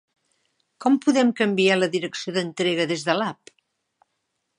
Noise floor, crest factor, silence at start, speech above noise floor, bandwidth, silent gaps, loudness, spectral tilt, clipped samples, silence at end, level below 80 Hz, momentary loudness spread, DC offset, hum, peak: -76 dBFS; 20 dB; 0.8 s; 55 dB; 11 kHz; none; -22 LUFS; -4.5 dB/octave; under 0.1%; 1.25 s; -76 dBFS; 8 LU; under 0.1%; none; -4 dBFS